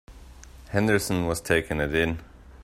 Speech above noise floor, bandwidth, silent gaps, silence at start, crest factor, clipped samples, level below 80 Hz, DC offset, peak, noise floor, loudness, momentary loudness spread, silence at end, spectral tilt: 22 dB; 16 kHz; none; 0.1 s; 22 dB; under 0.1%; -44 dBFS; under 0.1%; -6 dBFS; -46 dBFS; -25 LUFS; 6 LU; 0 s; -5 dB/octave